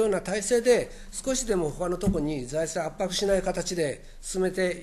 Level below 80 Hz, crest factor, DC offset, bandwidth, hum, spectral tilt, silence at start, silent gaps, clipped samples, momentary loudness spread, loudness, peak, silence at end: -42 dBFS; 16 dB; under 0.1%; 13 kHz; none; -4 dB/octave; 0 s; none; under 0.1%; 7 LU; -27 LUFS; -10 dBFS; 0 s